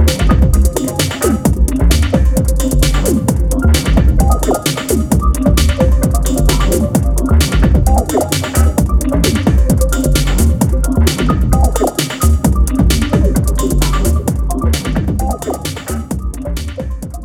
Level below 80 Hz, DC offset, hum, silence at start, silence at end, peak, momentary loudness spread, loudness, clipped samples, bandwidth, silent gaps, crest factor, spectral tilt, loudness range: -14 dBFS; under 0.1%; none; 0 s; 0 s; 0 dBFS; 6 LU; -14 LUFS; under 0.1%; 17.5 kHz; none; 12 dB; -5.5 dB/octave; 2 LU